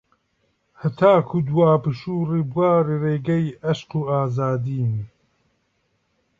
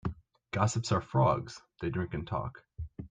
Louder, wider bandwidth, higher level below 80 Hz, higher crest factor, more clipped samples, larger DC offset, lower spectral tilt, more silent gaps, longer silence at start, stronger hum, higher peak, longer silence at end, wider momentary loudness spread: first, -21 LUFS vs -32 LUFS; second, 7.4 kHz vs 9.4 kHz; second, -58 dBFS vs -52 dBFS; about the same, 20 dB vs 18 dB; neither; neither; first, -9 dB/octave vs -6 dB/octave; neither; first, 0.8 s vs 0.05 s; neither; first, -2 dBFS vs -14 dBFS; first, 1.35 s vs 0.05 s; second, 9 LU vs 17 LU